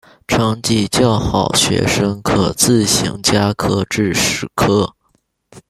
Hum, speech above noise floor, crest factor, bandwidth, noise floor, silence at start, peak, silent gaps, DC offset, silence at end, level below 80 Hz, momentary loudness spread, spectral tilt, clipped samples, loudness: none; 47 dB; 16 dB; 15.5 kHz; -62 dBFS; 0.3 s; 0 dBFS; none; under 0.1%; 0.1 s; -38 dBFS; 4 LU; -4 dB/octave; under 0.1%; -15 LUFS